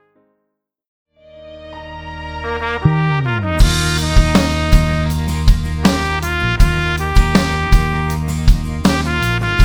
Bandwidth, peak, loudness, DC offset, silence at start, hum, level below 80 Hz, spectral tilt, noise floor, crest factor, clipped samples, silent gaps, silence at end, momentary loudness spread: over 20 kHz; 0 dBFS; -16 LUFS; under 0.1%; 1.35 s; none; -18 dBFS; -5.5 dB/octave; -73 dBFS; 14 dB; under 0.1%; none; 0 s; 12 LU